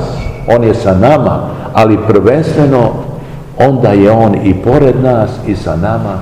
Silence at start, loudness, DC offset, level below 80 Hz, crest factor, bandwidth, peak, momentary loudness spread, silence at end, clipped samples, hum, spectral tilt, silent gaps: 0 s; -9 LUFS; 0.6%; -30 dBFS; 10 dB; 12 kHz; 0 dBFS; 10 LU; 0 s; 3%; none; -8.5 dB/octave; none